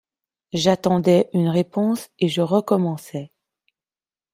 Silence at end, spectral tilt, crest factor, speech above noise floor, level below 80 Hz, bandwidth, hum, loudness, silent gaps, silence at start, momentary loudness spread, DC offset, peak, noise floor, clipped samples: 1.1 s; -6.5 dB/octave; 18 dB; over 70 dB; -60 dBFS; 15.5 kHz; none; -20 LUFS; none; 0.55 s; 12 LU; under 0.1%; -2 dBFS; under -90 dBFS; under 0.1%